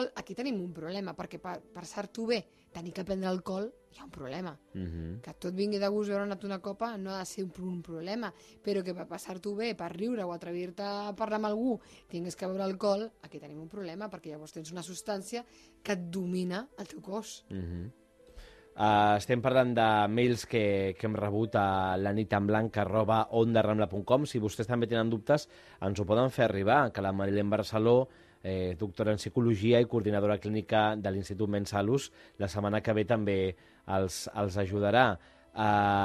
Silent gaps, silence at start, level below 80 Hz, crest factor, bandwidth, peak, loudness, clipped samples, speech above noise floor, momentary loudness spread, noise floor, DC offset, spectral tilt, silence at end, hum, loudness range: none; 0 s; -60 dBFS; 22 dB; 13 kHz; -10 dBFS; -31 LUFS; under 0.1%; 22 dB; 16 LU; -53 dBFS; under 0.1%; -6 dB/octave; 0 s; none; 9 LU